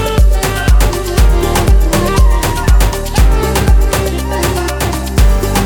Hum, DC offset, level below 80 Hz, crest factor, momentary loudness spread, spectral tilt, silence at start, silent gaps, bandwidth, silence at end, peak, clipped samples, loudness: none; under 0.1%; -12 dBFS; 10 dB; 4 LU; -5 dB/octave; 0 s; none; 19.5 kHz; 0 s; 0 dBFS; under 0.1%; -12 LUFS